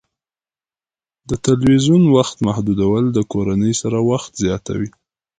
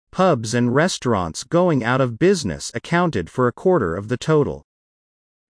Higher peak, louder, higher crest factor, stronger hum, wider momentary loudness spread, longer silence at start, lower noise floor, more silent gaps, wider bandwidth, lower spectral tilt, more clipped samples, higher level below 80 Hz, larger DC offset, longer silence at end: first, 0 dBFS vs -4 dBFS; first, -17 LUFS vs -20 LUFS; about the same, 16 dB vs 16 dB; neither; first, 11 LU vs 6 LU; first, 1.3 s vs 0.15 s; about the same, under -90 dBFS vs under -90 dBFS; neither; about the same, 9.6 kHz vs 10.5 kHz; about the same, -6.5 dB/octave vs -5.5 dB/octave; neither; first, -42 dBFS vs -48 dBFS; neither; second, 0.5 s vs 0.9 s